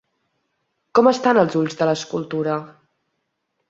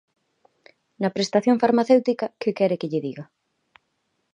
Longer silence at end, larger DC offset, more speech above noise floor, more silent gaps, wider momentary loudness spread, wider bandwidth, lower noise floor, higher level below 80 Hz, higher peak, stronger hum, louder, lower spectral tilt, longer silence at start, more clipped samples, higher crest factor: about the same, 1 s vs 1.1 s; neither; first, 56 dB vs 52 dB; neither; about the same, 10 LU vs 10 LU; second, 7.8 kHz vs 10 kHz; about the same, -74 dBFS vs -73 dBFS; first, -66 dBFS vs -74 dBFS; about the same, -2 dBFS vs -4 dBFS; neither; first, -19 LUFS vs -22 LUFS; about the same, -5.5 dB/octave vs -6 dB/octave; about the same, 0.95 s vs 1 s; neither; about the same, 20 dB vs 20 dB